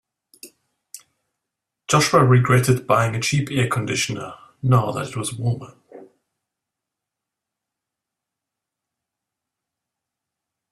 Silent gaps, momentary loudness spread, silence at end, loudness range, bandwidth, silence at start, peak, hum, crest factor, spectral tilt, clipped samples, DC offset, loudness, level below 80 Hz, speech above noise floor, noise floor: none; 12 LU; 4.65 s; 13 LU; 14 kHz; 0.45 s; -2 dBFS; none; 22 dB; -5 dB/octave; under 0.1%; under 0.1%; -19 LUFS; -56 dBFS; 66 dB; -85 dBFS